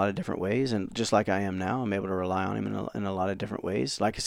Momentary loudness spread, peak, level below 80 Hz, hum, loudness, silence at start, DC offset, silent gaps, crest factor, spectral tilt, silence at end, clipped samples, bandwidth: 6 LU; -10 dBFS; -56 dBFS; none; -29 LUFS; 0 s; under 0.1%; none; 18 dB; -5.5 dB/octave; 0 s; under 0.1%; 15.5 kHz